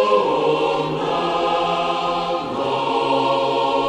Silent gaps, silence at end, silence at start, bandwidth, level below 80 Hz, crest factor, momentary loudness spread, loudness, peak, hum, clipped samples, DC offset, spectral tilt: none; 0 s; 0 s; 10.5 kHz; -52 dBFS; 14 dB; 4 LU; -20 LUFS; -4 dBFS; none; under 0.1%; under 0.1%; -5 dB/octave